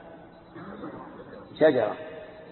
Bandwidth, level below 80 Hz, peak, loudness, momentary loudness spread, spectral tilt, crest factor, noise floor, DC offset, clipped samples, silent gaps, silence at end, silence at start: 4.3 kHz; -64 dBFS; -10 dBFS; -25 LUFS; 25 LU; -10 dB/octave; 20 dB; -48 dBFS; under 0.1%; under 0.1%; none; 0 s; 0.05 s